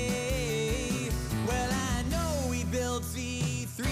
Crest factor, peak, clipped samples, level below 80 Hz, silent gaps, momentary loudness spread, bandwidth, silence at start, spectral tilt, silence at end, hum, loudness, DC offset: 12 dB; -18 dBFS; under 0.1%; -38 dBFS; none; 3 LU; 15.5 kHz; 0 s; -4.5 dB/octave; 0 s; none; -31 LUFS; under 0.1%